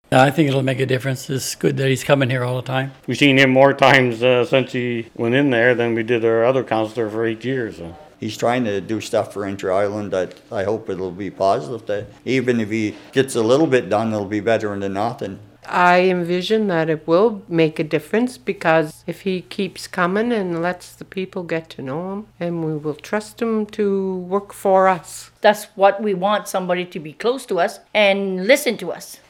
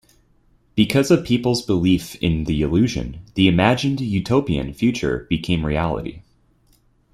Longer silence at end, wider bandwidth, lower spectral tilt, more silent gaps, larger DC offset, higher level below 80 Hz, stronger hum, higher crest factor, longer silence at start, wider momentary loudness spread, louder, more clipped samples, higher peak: second, 0.15 s vs 0.9 s; first, 17.5 kHz vs 15.5 kHz; about the same, -5.5 dB/octave vs -6 dB/octave; neither; neither; second, -58 dBFS vs -38 dBFS; neither; about the same, 18 dB vs 18 dB; second, 0.1 s vs 0.75 s; first, 12 LU vs 8 LU; about the same, -19 LUFS vs -20 LUFS; neither; about the same, 0 dBFS vs -2 dBFS